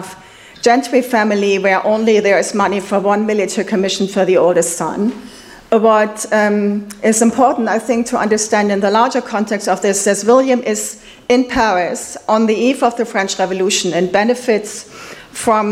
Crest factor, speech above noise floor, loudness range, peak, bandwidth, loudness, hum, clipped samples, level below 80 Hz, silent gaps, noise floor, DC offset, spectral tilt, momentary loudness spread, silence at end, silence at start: 14 dB; 25 dB; 2 LU; 0 dBFS; 15.5 kHz; -14 LUFS; none; under 0.1%; -50 dBFS; none; -39 dBFS; under 0.1%; -4 dB/octave; 8 LU; 0 s; 0 s